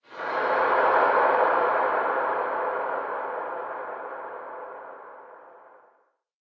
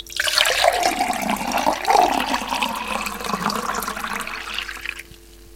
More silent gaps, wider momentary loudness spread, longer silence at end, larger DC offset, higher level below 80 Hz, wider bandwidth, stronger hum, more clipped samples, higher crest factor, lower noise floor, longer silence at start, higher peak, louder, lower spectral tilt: neither; first, 19 LU vs 10 LU; first, 0.8 s vs 0 s; second, under 0.1% vs 0.2%; second, -70 dBFS vs -46 dBFS; second, 6.2 kHz vs 17 kHz; neither; neither; about the same, 18 dB vs 22 dB; first, -66 dBFS vs -44 dBFS; about the same, 0.1 s vs 0 s; second, -8 dBFS vs 0 dBFS; second, -25 LUFS vs -21 LUFS; first, -5.5 dB/octave vs -2 dB/octave